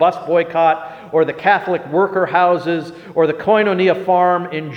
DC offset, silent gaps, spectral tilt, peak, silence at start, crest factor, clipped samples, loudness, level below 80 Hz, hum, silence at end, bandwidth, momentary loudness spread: under 0.1%; none; -7.5 dB/octave; 0 dBFS; 0 s; 14 dB; under 0.1%; -16 LUFS; -62 dBFS; none; 0 s; 7 kHz; 6 LU